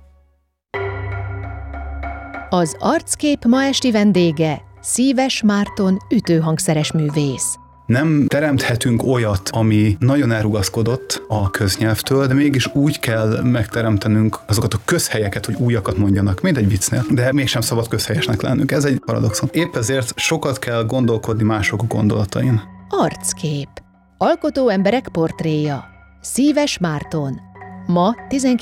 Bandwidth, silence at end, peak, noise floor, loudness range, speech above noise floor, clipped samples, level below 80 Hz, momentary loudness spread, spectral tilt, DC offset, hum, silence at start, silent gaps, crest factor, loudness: 17 kHz; 0 s; -6 dBFS; -61 dBFS; 3 LU; 44 dB; under 0.1%; -40 dBFS; 9 LU; -5.5 dB/octave; under 0.1%; none; 0.75 s; none; 12 dB; -18 LUFS